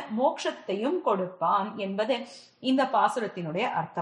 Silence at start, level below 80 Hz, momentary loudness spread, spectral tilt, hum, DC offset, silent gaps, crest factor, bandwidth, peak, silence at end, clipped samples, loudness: 0 s; -80 dBFS; 8 LU; -5.5 dB/octave; none; under 0.1%; none; 18 dB; 10 kHz; -10 dBFS; 0 s; under 0.1%; -28 LUFS